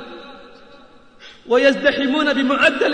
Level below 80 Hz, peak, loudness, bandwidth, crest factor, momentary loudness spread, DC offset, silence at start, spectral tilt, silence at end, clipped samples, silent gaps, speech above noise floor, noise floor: -54 dBFS; -2 dBFS; -16 LUFS; 9.8 kHz; 16 dB; 13 LU; 0.3%; 0 s; -3.5 dB/octave; 0 s; under 0.1%; none; 30 dB; -46 dBFS